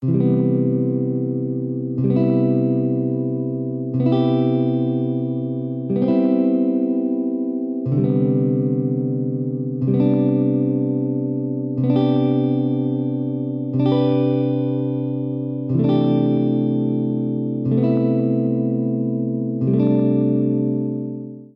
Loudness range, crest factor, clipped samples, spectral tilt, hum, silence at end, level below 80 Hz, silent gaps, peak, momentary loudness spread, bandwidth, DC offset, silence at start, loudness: 1 LU; 12 dB; under 0.1%; -12.5 dB/octave; none; 0.1 s; -62 dBFS; none; -6 dBFS; 7 LU; 5.2 kHz; under 0.1%; 0 s; -20 LUFS